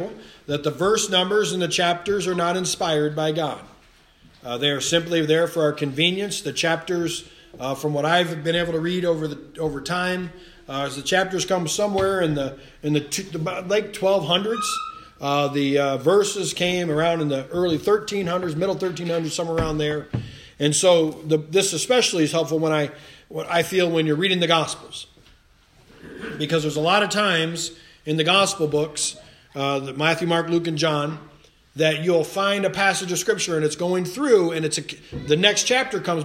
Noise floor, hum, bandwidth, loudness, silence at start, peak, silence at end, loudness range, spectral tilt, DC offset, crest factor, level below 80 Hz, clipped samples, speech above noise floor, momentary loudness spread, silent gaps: -55 dBFS; none; 16 kHz; -22 LUFS; 0 s; -2 dBFS; 0 s; 3 LU; -4 dB/octave; under 0.1%; 20 dB; -52 dBFS; under 0.1%; 33 dB; 11 LU; none